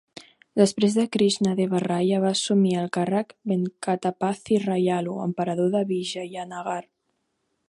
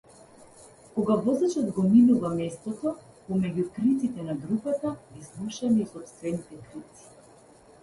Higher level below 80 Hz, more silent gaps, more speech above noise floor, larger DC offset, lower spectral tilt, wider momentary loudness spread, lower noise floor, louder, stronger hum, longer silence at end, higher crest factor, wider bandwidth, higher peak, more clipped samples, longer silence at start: second, -70 dBFS vs -62 dBFS; neither; first, 51 dB vs 28 dB; neither; second, -5.5 dB/octave vs -7.5 dB/octave; second, 9 LU vs 20 LU; first, -75 dBFS vs -54 dBFS; first, -24 LUFS vs -27 LUFS; neither; about the same, 0.9 s vs 1 s; about the same, 20 dB vs 18 dB; about the same, 11.5 kHz vs 11.5 kHz; first, -4 dBFS vs -10 dBFS; neither; second, 0.15 s vs 0.6 s